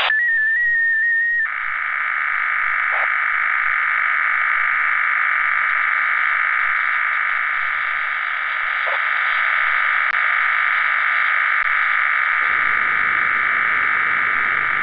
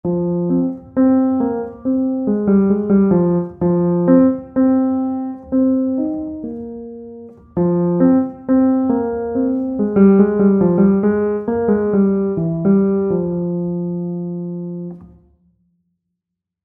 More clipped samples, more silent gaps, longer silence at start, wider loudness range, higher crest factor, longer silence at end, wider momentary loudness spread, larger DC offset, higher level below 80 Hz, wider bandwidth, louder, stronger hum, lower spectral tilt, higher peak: neither; neither; about the same, 0 s vs 0.05 s; second, 2 LU vs 6 LU; about the same, 14 dB vs 16 dB; second, 0 s vs 1.6 s; second, 4 LU vs 12 LU; neither; second, -58 dBFS vs -46 dBFS; first, 5.4 kHz vs 2.5 kHz; about the same, -17 LUFS vs -16 LUFS; neither; second, -3 dB/octave vs -14.5 dB/octave; second, -6 dBFS vs 0 dBFS